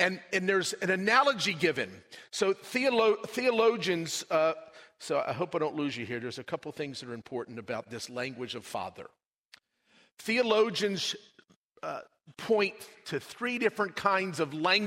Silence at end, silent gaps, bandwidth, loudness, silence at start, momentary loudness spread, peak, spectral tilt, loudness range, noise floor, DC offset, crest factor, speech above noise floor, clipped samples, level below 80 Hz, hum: 0 s; 9.26-9.31 s, 9.38-9.49 s, 10.12-10.17 s, 11.56-11.70 s; 16 kHz; -30 LUFS; 0 s; 14 LU; -10 dBFS; -3.5 dB/octave; 10 LU; -66 dBFS; under 0.1%; 22 dB; 36 dB; under 0.1%; -76 dBFS; none